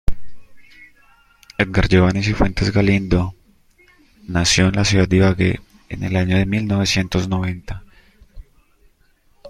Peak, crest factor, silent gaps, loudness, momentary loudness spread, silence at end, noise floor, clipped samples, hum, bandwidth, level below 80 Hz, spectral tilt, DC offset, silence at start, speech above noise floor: -2 dBFS; 18 dB; none; -18 LUFS; 15 LU; 0 s; -57 dBFS; under 0.1%; none; 12 kHz; -32 dBFS; -5 dB/octave; under 0.1%; 0.05 s; 40 dB